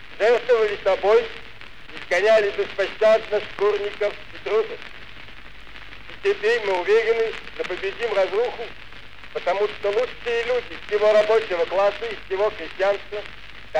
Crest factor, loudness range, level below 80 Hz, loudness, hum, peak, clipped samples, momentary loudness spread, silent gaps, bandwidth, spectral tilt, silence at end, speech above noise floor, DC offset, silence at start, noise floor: 14 dB; 4 LU; -52 dBFS; -22 LUFS; none; -8 dBFS; under 0.1%; 22 LU; none; 9.8 kHz; -3.5 dB/octave; 0 s; 21 dB; 1%; 0.05 s; -42 dBFS